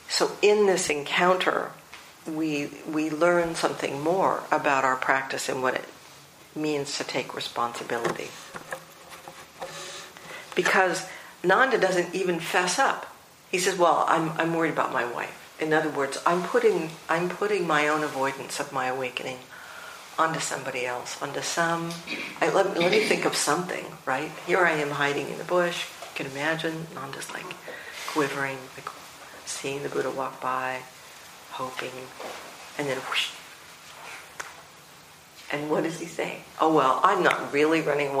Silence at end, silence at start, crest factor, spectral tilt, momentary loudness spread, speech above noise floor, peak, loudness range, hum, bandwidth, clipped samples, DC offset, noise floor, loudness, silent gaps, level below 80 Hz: 0 s; 0 s; 24 dB; -3.5 dB/octave; 18 LU; 24 dB; -2 dBFS; 8 LU; none; 15.5 kHz; under 0.1%; under 0.1%; -50 dBFS; -26 LUFS; none; -70 dBFS